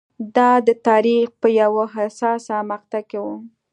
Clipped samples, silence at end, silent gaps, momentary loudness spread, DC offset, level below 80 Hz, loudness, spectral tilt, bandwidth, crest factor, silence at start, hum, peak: under 0.1%; 0.25 s; none; 13 LU; under 0.1%; -74 dBFS; -18 LUFS; -5.5 dB/octave; 9.2 kHz; 16 dB; 0.2 s; none; -2 dBFS